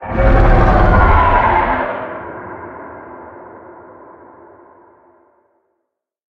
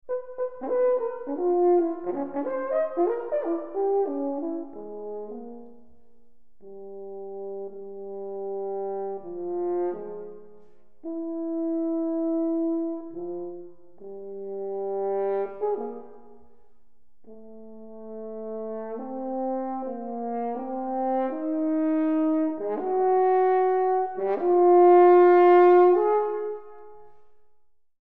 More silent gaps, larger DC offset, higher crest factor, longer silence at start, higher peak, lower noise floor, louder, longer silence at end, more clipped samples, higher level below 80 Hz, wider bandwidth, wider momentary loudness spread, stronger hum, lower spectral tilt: neither; second, under 0.1% vs 0.6%; about the same, 16 dB vs 18 dB; about the same, 0 s vs 0.1 s; first, 0 dBFS vs -8 dBFS; first, -74 dBFS vs -67 dBFS; first, -13 LUFS vs -24 LUFS; first, 2.8 s vs 0 s; neither; first, -20 dBFS vs -70 dBFS; first, 5.6 kHz vs 3.8 kHz; about the same, 23 LU vs 21 LU; neither; about the same, -9 dB/octave vs -9 dB/octave